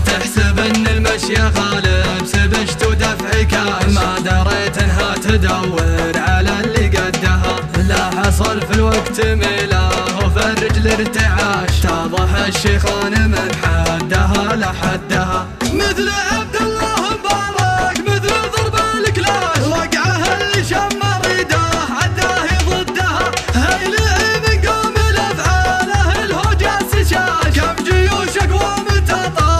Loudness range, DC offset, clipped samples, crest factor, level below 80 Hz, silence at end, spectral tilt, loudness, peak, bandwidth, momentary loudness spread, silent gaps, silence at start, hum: 1 LU; 0.2%; under 0.1%; 14 dB; -22 dBFS; 0 s; -4.5 dB/octave; -15 LUFS; 0 dBFS; 15 kHz; 2 LU; none; 0 s; none